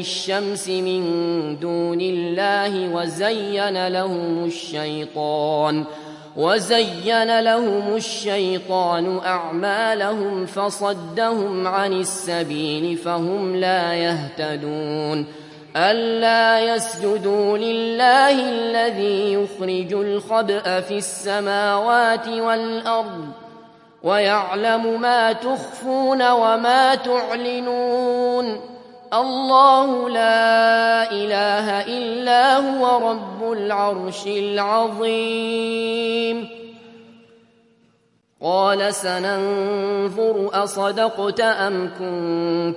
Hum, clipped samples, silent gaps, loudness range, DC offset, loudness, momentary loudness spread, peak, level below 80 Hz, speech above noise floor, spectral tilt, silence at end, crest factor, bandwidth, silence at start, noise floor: none; under 0.1%; none; 5 LU; under 0.1%; -20 LUFS; 9 LU; 0 dBFS; -72 dBFS; 43 dB; -4 dB/octave; 0 s; 18 dB; 11.5 kHz; 0 s; -62 dBFS